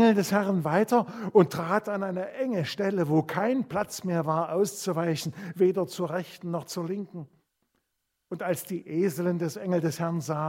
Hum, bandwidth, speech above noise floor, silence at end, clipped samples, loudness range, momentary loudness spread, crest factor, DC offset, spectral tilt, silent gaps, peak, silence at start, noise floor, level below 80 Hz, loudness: none; 16.5 kHz; 53 dB; 0 s; under 0.1%; 6 LU; 10 LU; 22 dB; under 0.1%; -6 dB/octave; none; -6 dBFS; 0 s; -80 dBFS; -72 dBFS; -28 LUFS